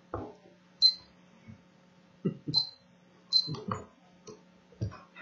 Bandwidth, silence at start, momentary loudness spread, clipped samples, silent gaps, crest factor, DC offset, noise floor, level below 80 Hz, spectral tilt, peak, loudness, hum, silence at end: 7.8 kHz; 0.15 s; 18 LU; under 0.1%; none; 24 dB; under 0.1%; -61 dBFS; -64 dBFS; -4.5 dB/octave; -12 dBFS; -29 LUFS; none; 0 s